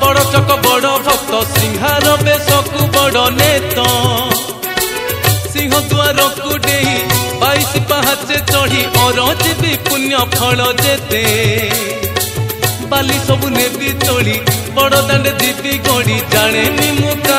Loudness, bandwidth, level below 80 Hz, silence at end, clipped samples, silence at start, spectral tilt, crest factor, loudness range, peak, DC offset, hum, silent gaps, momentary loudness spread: -12 LUFS; 16.5 kHz; -36 dBFS; 0 s; under 0.1%; 0 s; -3.5 dB/octave; 12 dB; 2 LU; 0 dBFS; under 0.1%; none; none; 5 LU